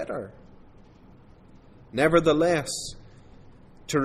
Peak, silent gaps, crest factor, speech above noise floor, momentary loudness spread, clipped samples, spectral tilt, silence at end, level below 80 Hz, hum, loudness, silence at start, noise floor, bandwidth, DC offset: -6 dBFS; none; 20 dB; 28 dB; 20 LU; under 0.1%; -5 dB/octave; 0 s; -50 dBFS; none; -24 LUFS; 0 s; -51 dBFS; 15 kHz; under 0.1%